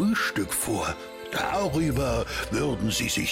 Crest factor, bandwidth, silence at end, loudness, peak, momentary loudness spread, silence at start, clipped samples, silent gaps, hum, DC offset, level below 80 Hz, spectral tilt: 10 dB; 16.5 kHz; 0 s; -27 LUFS; -16 dBFS; 5 LU; 0 s; under 0.1%; none; none; under 0.1%; -42 dBFS; -4 dB/octave